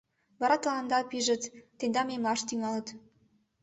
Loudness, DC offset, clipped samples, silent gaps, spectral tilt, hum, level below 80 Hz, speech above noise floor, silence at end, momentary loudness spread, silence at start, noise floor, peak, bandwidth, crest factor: -31 LUFS; under 0.1%; under 0.1%; none; -2.5 dB/octave; none; -74 dBFS; 38 dB; 0.65 s; 8 LU; 0.4 s; -69 dBFS; -12 dBFS; 8.4 kHz; 20 dB